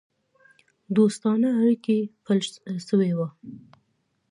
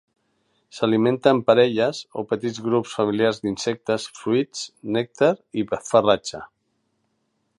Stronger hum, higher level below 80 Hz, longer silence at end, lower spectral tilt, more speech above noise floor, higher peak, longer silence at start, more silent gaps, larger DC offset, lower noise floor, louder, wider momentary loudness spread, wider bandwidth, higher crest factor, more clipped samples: neither; second, -74 dBFS vs -62 dBFS; second, 0.75 s vs 1.1 s; first, -7 dB/octave vs -5 dB/octave; about the same, 49 dB vs 50 dB; second, -8 dBFS vs -2 dBFS; first, 0.9 s vs 0.75 s; neither; neither; about the same, -72 dBFS vs -72 dBFS; about the same, -24 LUFS vs -22 LUFS; about the same, 12 LU vs 10 LU; about the same, 11.5 kHz vs 11.5 kHz; about the same, 16 dB vs 20 dB; neither